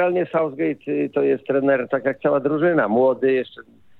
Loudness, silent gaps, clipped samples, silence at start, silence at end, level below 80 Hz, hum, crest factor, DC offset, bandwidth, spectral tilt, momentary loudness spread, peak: -20 LUFS; none; under 0.1%; 0 s; 0.4 s; -70 dBFS; none; 14 dB; under 0.1%; 4.2 kHz; -9.5 dB/octave; 6 LU; -6 dBFS